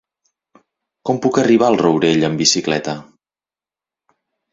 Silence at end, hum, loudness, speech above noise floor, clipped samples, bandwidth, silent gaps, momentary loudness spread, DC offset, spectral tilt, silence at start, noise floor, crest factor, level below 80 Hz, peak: 1.5 s; none; -15 LUFS; over 75 dB; under 0.1%; 7.8 kHz; none; 13 LU; under 0.1%; -4 dB/octave; 1.05 s; under -90 dBFS; 18 dB; -56 dBFS; 0 dBFS